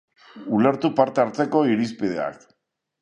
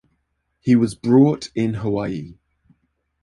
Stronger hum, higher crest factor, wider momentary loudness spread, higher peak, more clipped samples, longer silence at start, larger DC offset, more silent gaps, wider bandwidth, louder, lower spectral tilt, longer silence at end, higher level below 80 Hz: neither; about the same, 20 dB vs 18 dB; second, 9 LU vs 14 LU; about the same, -2 dBFS vs -2 dBFS; neither; second, 0.35 s vs 0.65 s; neither; neither; second, 10 kHz vs 11.5 kHz; second, -22 LUFS vs -19 LUFS; about the same, -7 dB/octave vs -7.5 dB/octave; second, 0.65 s vs 0.9 s; second, -66 dBFS vs -52 dBFS